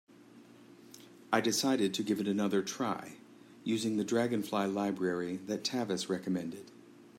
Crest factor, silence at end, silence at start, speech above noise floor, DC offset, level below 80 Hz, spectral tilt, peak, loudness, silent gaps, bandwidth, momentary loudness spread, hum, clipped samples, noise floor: 20 dB; 0 s; 0.35 s; 24 dB; under 0.1%; -80 dBFS; -4.5 dB/octave; -14 dBFS; -33 LUFS; none; 16 kHz; 19 LU; none; under 0.1%; -57 dBFS